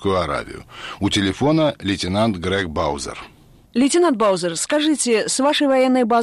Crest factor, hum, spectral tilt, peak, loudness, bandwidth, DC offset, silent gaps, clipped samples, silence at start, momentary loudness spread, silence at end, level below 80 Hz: 12 dB; none; -4 dB/octave; -8 dBFS; -19 LUFS; 13 kHz; under 0.1%; none; under 0.1%; 0 s; 11 LU; 0 s; -46 dBFS